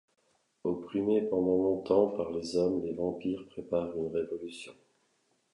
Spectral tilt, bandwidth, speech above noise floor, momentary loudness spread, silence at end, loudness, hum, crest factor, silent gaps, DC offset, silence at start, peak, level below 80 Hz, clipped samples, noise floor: -7 dB/octave; 11 kHz; 43 dB; 12 LU; 0.8 s; -31 LUFS; none; 20 dB; none; under 0.1%; 0.65 s; -12 dBFS; -64 dBFS; under 0.1%; -74 dBFS